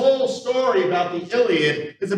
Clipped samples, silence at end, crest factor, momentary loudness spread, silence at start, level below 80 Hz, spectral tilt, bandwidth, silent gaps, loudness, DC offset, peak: under 0.1%; 0 s; 14 dB; 5 LU; 0 s; -78 dBFS; -5 dB/octave; 10 kHz; none; -20 LUFS; under 0.1%; -6 dBFS